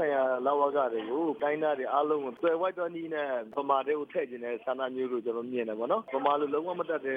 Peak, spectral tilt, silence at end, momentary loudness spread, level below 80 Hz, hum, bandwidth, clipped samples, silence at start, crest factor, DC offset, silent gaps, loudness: -12 dBFS; -7.5 dB/octave; 0 s; 6 LU; -82 dBFS; none; 4.8 kHz; under 0.1%; 0 s; 18 dB; under 0.1%; none; -31 LUFS